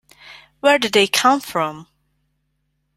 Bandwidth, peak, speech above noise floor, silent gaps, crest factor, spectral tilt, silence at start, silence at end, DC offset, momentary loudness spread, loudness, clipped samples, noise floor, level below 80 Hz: 16 kHz; 0 dBFS; 53 dB; none; 20 dB; -2.5 dB/octave; 0.3 s; 1.15 s; under 0.1%; 9 LU; -17 LUFS; under 0.1%; -70 dBFS; -64 dBFS